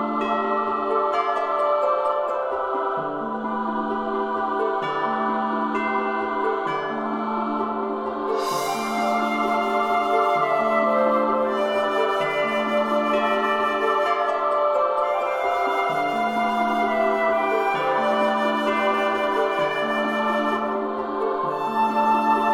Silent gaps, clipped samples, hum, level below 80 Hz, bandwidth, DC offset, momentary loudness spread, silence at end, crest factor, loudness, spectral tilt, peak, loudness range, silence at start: none; under 0.1%; none; -60 dBFS; 16 kHz; under 0.1%; 5 LU; 0 s; 14 dB; -22 LUFS; -4.5 dB/octave; -8 dBFS; 4 LU; 0 s